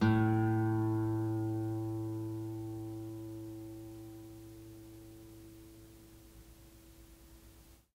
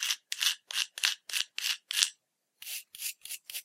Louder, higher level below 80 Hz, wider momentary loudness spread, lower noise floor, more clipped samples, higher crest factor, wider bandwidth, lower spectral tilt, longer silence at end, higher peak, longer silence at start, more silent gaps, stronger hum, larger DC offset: second, -36 LUFS vs -31 LUFS; first, -60 dBFS vs under -90 dBFS; first, 26 LU vs 12 LU; second, -59 dBFS vs -71 dBFS; neither; second, 20 dB vs 32 dB; about the same, 16 kHz vs 16.5 kHz; first, -8.5 dB/octave vs 7 dB/octave; first, 0.3 s vs 0 s; second, -18 dBFS vs -2 dBFS; about the same, 0 s vs 0 s; neither; neither; neither